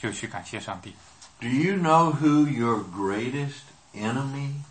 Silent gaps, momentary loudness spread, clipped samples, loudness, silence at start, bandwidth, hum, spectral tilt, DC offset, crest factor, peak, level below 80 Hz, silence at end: none; 17 LU; under 0.1%; -25 LUFS; 0 s; 8.8 kHz; none; -6.5 dB/octave; under 0.1%; 20 dB; -6 dBFS; -64 dBFS; 0.05 s